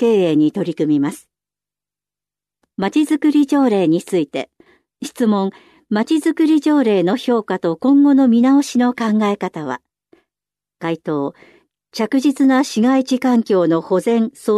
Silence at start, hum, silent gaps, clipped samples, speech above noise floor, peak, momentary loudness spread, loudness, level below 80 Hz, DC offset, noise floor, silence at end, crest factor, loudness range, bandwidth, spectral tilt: 0 s; 50 Hz at -50 dBFS; none; under 0.1%; 74 dB; -6 dBFS; 12 LU; -16 LUFS; -68 dBFS; under 0.1%; -89 dBFS; 0 s; 12 dB; 6 LU; 13 kHz; -6 dB/octave